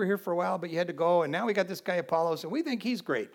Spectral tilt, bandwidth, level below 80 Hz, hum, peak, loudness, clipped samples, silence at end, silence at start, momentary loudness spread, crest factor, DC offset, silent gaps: -6 dB/octave; 17.5 kHz; -88 dBFS; none; -14 dBFS; -30 LUFS; under 0.1%; 0.05 s; 0 s; 6 LU; 16 dB; under 0.1%; none